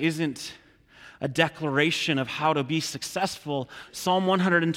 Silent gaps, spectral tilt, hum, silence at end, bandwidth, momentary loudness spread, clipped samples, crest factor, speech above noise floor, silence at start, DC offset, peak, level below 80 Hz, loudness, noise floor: none; -4.5 dB/octave; none; 0 s; 16.5 kHz; 10 LU; under 0.1%; 20 dB; 26 dB; 0 s; under 0.1%; -6 dBFS; -64 dBFS; -26 LUFS; -52 dBFS